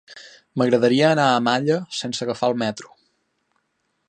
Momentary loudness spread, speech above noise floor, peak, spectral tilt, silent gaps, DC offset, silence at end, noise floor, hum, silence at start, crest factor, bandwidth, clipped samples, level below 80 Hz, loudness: 11 LU; 52 dB; -2 dBFS; -5 dB/octave; none; under 0.1%; 1.2 s; -72 dBFS; none; 0.1 s; 20 dB; 9.8 kHz; under 0.1%; -70 dBFS; -20 LUFS